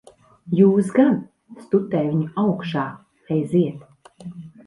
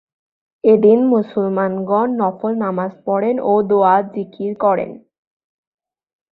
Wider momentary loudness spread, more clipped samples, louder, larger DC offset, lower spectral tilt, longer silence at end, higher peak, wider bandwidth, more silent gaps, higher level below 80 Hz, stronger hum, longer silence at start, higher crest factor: first, 22 LU vs 10 LU; neither; second, -21 LUFS vs -16 LUFS; neither; second, -8.5 dB/octave vs -11.5 dB/octave; second, 0.2 s vs 1.35 s; about the same, -4 dBFS vs -2 dBFS; first, 11.5 kHz vs 4.2 kHz; neither; about the same, -62 dBFS vs -64 dBFS; neither; second, 0.45 s vs 0.65 s; about the same, 18 dB vs 16 dB